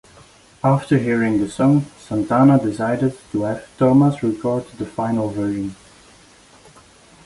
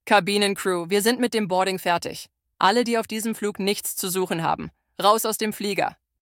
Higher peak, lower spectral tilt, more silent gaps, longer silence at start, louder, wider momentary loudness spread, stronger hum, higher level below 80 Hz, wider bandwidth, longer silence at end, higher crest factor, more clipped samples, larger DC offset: about the same, -4 dBFS vs -2 dBFS; first, -8 dB/octave vs -3.5 dB/octave; neither; first, 0.65 s vs 0.05 s; first, -19 LUFS vs -23 LUFS; first, 11 LU vs 8 LU; neither; first, -52 dBFS vs -62 dBFS; second, 11.5 kHz vs 18 kHz; first, 1.5 s vs 0.3 s; second, 16 dB vs 22 dB; neither; neither